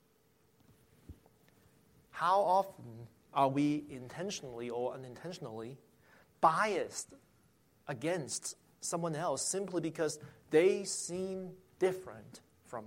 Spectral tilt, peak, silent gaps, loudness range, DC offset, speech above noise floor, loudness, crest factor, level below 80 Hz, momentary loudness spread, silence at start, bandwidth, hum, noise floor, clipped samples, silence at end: -4 dB/octave; -14 dBFS; none; 3 LU; under 0.1%; 36 dB; -35 LUFS; 22 dB; -72 dBFS; 20 LU; 1.1 s; 16.5 kHz; none; -71 dBFS; under 0.1%; 0 s